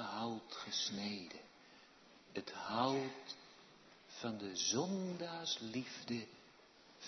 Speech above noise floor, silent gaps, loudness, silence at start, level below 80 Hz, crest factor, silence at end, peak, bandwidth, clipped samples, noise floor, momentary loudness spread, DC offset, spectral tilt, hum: 23 dB; none; -42 LUFS; 0 s; -84 dBFS; 24 dB; 0 s; -20 dBFS; 6.2 kHz; under 0.1%; -64 dBFS; 24 LU; under 0.1%; -3 dB/octave; none